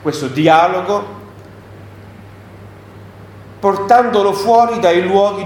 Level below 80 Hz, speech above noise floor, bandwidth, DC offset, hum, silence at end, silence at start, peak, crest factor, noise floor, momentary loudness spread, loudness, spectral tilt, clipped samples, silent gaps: -52 dBFS; 24 dB; 18 kHz; under 0.1%; none; 0 s; 0 s; 0 dBFS; 16 dB; -36 dBFS; 9 LU; -13 LUFS; -5.5 dB/octave; under 0.1%; none